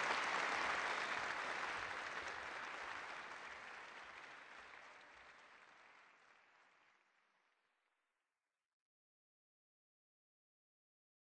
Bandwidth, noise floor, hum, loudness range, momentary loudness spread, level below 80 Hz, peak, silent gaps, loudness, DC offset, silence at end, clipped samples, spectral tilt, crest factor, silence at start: 10 kHz; under -90 dBFS; none; 23 LU; 22 LU; -82 dBFS; -24 dBFS; none; -44 LUFS; under 0.1%; 4.7 s; under 0.1%; -1 dB/octave; 24 dB; 0 s